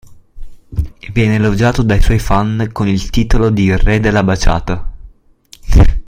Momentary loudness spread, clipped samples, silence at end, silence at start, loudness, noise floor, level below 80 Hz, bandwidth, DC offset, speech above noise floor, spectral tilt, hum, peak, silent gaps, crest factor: 11 LU; under 0.1%; 0.05 s; 0.1 s; -14 LUFS; -44 dBFS; -16 dBFS; 15 kHz; under 0.1%; 32 dB; -6.5 dB/octave; none; 0 dBFS; none; 12 dB